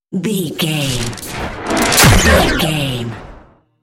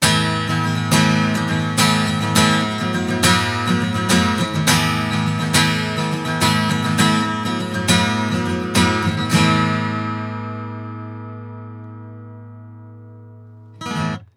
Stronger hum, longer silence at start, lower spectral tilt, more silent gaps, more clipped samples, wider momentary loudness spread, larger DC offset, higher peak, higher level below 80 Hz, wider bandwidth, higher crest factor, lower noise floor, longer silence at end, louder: neither; about the same, 0.1 s vs 0 s; about the same, -3.5 dB/octave vs -4 dB/octave; neither; neither; about the same, 16 LU vs 17 LU; neither; about the same, 0 dBFS vs -2 dBFS; first, -26 dBFS vs -46 dBFS; about the same, 17.5 kHz vs 18 kHz; about the same, 16 dB vs 18 dB; about the same, -43 dBFS vs -41 dBFS; first, 0.45 s vs 0.1 s; first, -14 LUFS vs -18 LUFS